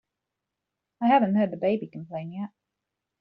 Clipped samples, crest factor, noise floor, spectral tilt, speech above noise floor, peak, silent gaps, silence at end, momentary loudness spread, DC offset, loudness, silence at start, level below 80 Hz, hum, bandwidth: under 0.1%; 18 dB; -85 dBFS; -6 dB/octave; 61 dB; -10 dBFS; none; 0.75 s; 16 LU; under 0.1%; -25 LUFS; 1 s; -72 dBFS; none; 5 kHz